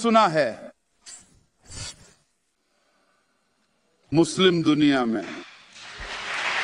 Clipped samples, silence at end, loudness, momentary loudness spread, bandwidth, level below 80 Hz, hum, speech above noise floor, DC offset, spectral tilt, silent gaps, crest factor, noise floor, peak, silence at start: under 0.1%; 0 s; -22 LUFS; 25 LU; 11 kHz; -56 dBFS; none; 51 dB; under 0.1%; -5 dB/octave; none; 20 dB; -72 dBFS; -6 dBFS; 0 s